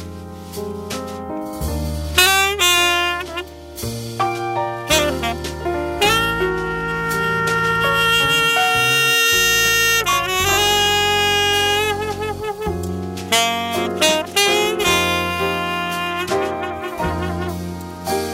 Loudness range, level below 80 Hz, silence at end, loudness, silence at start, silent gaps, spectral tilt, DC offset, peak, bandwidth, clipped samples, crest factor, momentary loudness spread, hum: 6 LU; -38 dBFS; 0 s; -17 LUFS; 0 s; none; -2.5 dB/octave; under 0.1%; -2 dBFS; 16.5 kHz; under 0.1%; 18 dB; 14 LU; none